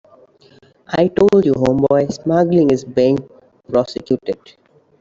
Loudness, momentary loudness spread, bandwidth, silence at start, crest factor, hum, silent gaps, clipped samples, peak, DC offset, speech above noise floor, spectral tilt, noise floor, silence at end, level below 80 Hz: -16 LUFS; 9 LU; 7.6 kHz; 0.9 s; 14 dB; none; none; under 0.1%; -2 dBFS; under 0.1%; 35 dB; -7.5 dB/octave; -49 dBFS; 0.65 s; -50 dBFS